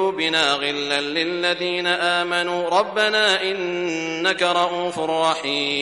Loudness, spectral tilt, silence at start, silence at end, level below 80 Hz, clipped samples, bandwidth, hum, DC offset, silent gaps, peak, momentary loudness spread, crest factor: -20 LUFS; -2.5 dB/octave; 0 s; 0 s; -62 dBFS; under 0.1%; 11.5 kHz; none; under 0.1%; none; -4 dBFS; 6 LU; 18 dB